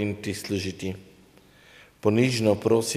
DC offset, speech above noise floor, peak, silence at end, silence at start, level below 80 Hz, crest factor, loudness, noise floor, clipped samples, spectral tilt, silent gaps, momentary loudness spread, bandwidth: under 0.1%; 30 dB; -6 dBFS; 0 s; 0 s; -62 dBFS; 20 dB; -25 LUFS; -55 dBFS; under 0.1%; -5.5 dB/octave; none; 13 LU; 16 kHz